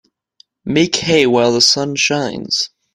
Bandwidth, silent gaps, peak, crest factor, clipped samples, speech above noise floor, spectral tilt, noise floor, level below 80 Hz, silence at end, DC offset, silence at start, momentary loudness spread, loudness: 16 kHz; none; 0 dBFS; 16 dB; under 0.1%; 39 dB; -3 dB/octave; -53 dBFS; -52 dBFS; 0.25 s; under 0.1%; 0.65 s; 8 LU; -14 LUFS